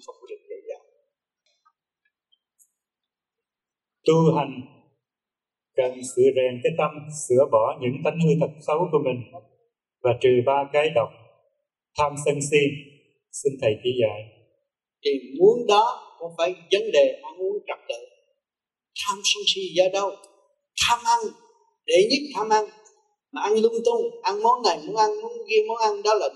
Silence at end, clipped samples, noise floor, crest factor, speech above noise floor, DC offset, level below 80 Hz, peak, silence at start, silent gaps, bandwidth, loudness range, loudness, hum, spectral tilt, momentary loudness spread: 0.05 s; under 0.1%; under -90 dBFS; 18 dB; over 68 dB; under 0.1%; -66 dBFS; -6 dBFS; 0.1 s; none; 12.5 kHz; 4 LU; -23 LUFS; none; -4.5 dB/octave; 16 LU